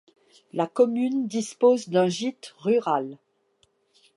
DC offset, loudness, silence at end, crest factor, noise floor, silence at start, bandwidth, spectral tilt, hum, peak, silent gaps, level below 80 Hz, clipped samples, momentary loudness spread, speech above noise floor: under 0.1%; -24 LUFS; 1 s; 18 dB; -67 dBFS; 0.55 s; 11.5 kHz; -5.5 dB/octave; none; -8 dBFS; none; -78 dBFS; under 0.1%; 11 LU; 44 dB